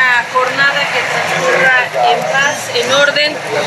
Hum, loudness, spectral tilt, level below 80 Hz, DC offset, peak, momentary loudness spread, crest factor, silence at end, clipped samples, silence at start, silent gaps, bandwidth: none; -12 LUFS; -2 dB/octave; -64 dBFS; under 0.1%; 0 dBFS; 5 LU; 12 dB; 0 s; under 0.1%; 0 s; none; 14 kHz